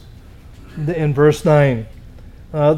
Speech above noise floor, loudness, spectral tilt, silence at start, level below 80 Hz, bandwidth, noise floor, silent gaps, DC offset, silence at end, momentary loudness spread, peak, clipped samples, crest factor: 25 dB; -16 LUFS; -7.5 dB/octave; 0.45 s; -38 dBFS; 13 kHz; -39 dBFS; none; under 0.1%; 0 s; 17 LU; -2 dBFS; under 0.1%; 16 dB